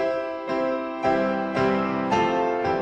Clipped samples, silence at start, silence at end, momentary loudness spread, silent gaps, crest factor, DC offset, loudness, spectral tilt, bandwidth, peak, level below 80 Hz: under 0.1%; 0 s; 0 s; 4 LU; none; 14 dB; under 0.1%; -24 LUFS; -6.5 dB/octave; 9.2 kHz; -8 dBFS; -54 dBFS